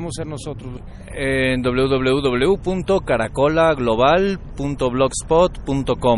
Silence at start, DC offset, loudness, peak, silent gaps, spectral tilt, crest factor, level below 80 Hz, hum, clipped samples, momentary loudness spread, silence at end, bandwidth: 0 s; under 0.1%; -19 LUFS; -2 dBFS; none; -5.5 dB/octave; 16 dB; -34 dBFS; none; under 0.1%; 13 LU; 0 s; 11.5 kHz